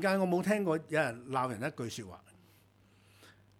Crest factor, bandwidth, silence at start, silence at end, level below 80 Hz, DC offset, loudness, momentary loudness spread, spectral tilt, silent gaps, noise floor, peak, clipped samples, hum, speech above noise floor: 20 dB; 16 kHz; 0 s; 0.3 s; -74 dBFS; under 0.1%; -33 LUFS; 11 LU; -6 dB/octave; none; -65 dBFS; -16 dBFS; under 0.1%; none; 32 dB